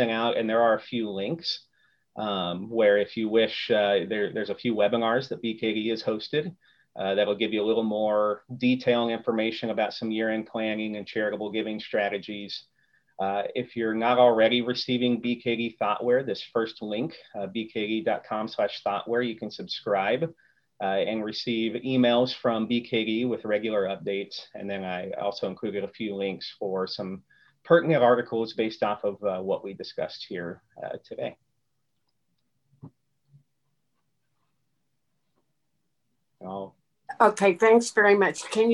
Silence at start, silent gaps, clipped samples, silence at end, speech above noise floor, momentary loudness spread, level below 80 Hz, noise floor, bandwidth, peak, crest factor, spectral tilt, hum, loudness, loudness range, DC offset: 0 s; none; under 0.1%; 0 s; 53 dB; 14 LU; -72 dBFS; -79 dBFS; 11.5 kHz; -4 dBFS; 22 dB; -5 dB/octave; none; -26 LUFS; 8 LU; under 0.1%